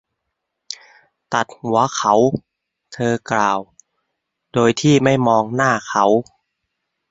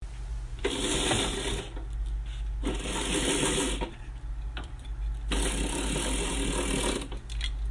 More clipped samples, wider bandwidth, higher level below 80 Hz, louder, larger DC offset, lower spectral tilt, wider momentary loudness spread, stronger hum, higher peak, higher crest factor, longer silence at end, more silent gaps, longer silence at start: neither; second, 8 kHz vs 11.5 kHz; second, -56 dBFS vs -34 dBFS; first, -17 LUFS vs -31 LUFS; neither; first, -5 dB/octave vs -3.5 dB/octave; about the same, 12 LU vs 13 LU; neither; first, 0 dBFS vs -12 dBFS; about the same, 18 dB vs 18 dB; first, 0.9 s vs 0 s; neither; first, 0.7 s vs 0 s